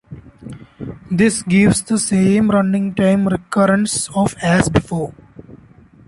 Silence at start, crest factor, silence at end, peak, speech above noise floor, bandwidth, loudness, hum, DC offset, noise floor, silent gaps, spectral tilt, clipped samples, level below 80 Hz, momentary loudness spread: 0.1 s; 14 dB; 0.55 s; -2 dBFS; 30 dB; 11.5 kHz; -16 LUFS; none; under 0.1%; -45 dBFS; none; -5.5 dB/octave; under 0.1%; -40 dBFS; 19 LU